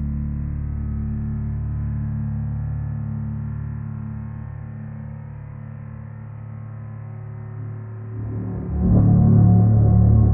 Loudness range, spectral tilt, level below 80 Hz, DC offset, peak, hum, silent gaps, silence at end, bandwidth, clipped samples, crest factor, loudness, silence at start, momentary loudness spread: 15 LU; -14.5 dB/octave; -30 dBFS; under 0.1%; -4 dBFS; none; none; 0 s; 2.2 kHz; under 0.1%; 16 dB; -21 LUFS; 0 s; 20 LU